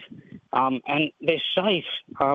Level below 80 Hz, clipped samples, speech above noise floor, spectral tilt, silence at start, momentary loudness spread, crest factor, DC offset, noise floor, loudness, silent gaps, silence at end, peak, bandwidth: -66 dBFS; under 0.1%; 21 dB; -7 dB/octave; 0 s; 6 LU; 20 dB; under 0.1%; -45 dBFS; -24 LUFS; none; 0 s; -6 dBFS; 7.4 kHz